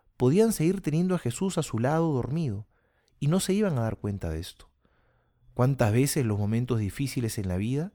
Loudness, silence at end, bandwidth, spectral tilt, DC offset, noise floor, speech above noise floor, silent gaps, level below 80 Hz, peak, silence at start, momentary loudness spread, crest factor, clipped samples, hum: -27 LUFS; 0.05 s; over 20 kHz; -6.5 dB/octave; under 0.1%; -67 dBFS; 41 dB; none; -50 dBFS; -10 dBFS; 0.2 s; 10 LU; 18 dB; under 0.1%; none